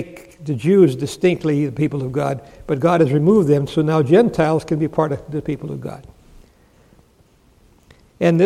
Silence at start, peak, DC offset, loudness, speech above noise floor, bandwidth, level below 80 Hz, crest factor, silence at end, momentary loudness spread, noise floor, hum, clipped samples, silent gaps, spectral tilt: 0 s; -2 dBFS; under 0.1%; -18 LUFS; 37 dB; 13.5 kHz; -50 dBFS; 16 dB; 0 s; 15 LU; -54 dBFS; none; under 0.1%; none; -8 dB/octave